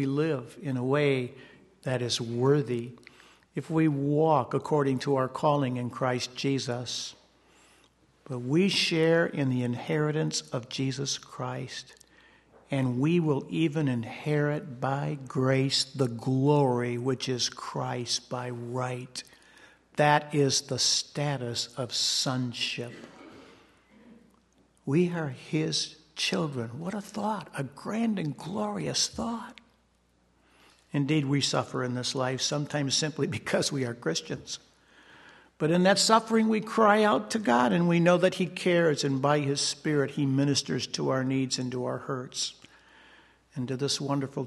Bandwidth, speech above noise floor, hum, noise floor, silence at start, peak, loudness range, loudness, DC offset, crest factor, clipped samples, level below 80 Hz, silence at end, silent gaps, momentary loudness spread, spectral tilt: 12.5 kHz; 40 dB; none; -67 dBFS; 0 s; -6 dBFS; 7 LU; -28 LUFS; under 0.1%; 22 dB; under 0.1%; -68 dBFS; 0 s; none; 11 LU; -4.5 dB/octave